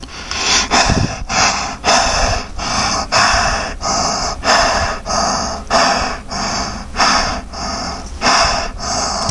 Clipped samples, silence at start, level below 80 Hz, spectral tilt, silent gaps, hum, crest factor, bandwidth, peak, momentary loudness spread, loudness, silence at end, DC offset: under 0.1%; 0 s; -28 dBFS; -2 dB/octave; none; none; 16 dB; 11.5 kHz; 0 dBFS; 9 LU; -15 LUFS; 0 s; under 0.1%